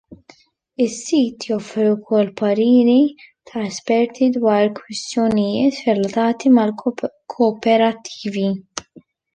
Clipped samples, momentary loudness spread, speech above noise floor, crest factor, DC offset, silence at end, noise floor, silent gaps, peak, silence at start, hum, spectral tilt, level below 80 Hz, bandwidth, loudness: under 0.1%; 13 LU; 34 dB; 14 dB; under 0.1%; 0.55 s; -51 dBFS; none; -4 dBFS; 0.1 s; none; -5.5 dB/octave; -60 dBFS; 9.6 kHz; -18 LUFS